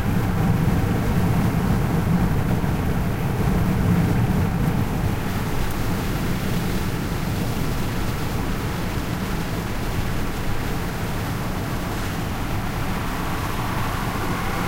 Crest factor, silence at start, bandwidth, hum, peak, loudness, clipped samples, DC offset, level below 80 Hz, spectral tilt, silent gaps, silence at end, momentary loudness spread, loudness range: 14 dB; 0 s; 16 kHz; none; -8 dBFS; -24 LUFS; under 0.1%; under 0.1%; -30 dBFS; -6.5 dB/octave; none; 0 s; 6 LU; 5 LU